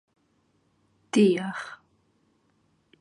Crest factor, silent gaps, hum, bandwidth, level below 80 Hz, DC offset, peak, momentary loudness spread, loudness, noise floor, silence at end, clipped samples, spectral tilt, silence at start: 20 dB; none; none; 11 kHz; -78 dBFS; under 0.1%; -10 dBFS; 21 LU; -25 LUFS; -69 dBFS; 1.25 s; under 0.1%; -6 dB/octave; 1.15 s